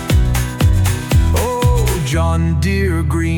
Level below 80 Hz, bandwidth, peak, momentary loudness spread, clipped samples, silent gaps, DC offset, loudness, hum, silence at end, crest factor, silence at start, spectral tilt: -20 dBFS; 19 kHz; -4 dBFS; 2 LU; under 0.1%; none; under 0.1%; -16 LUFS; none; 0 s; 10 dB; 0 s; -6 dB/octave